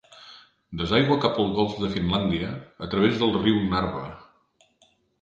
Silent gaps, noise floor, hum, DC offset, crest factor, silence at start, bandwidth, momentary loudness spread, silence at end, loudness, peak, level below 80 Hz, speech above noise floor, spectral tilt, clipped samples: none; -64 dBFS; none; under 0.1%; 20 dB; 0.2 s; 7.6 kHz; 15 LU; 1 s; -24 LUFS; -6 dBFS; -46 dBFS; 40 dB; -7 dB/octave; under 0.1%